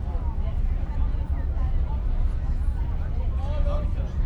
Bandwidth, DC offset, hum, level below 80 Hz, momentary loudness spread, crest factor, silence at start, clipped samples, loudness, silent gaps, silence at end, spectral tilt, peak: 4.4 kHz; under 0.1%; none; -24 dBFS; 2 LU; 12 dB; 0 s; under 0.1%; -29 LUFS; none; 0 s; -9 dB/octave; -12 dBFS